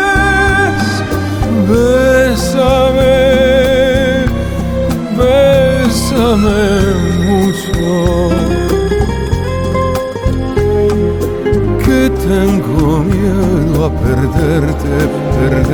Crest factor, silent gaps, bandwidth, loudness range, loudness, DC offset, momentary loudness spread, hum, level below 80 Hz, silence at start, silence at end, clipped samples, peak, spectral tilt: 10 dB; none; 19.5 kHz; 3 LU; -12 LUFS; under 0.1%; 6 LU; none; -22 dBFS; 0 s; 0 s; under 0.1%; 0 dBFS; -6 dB/octave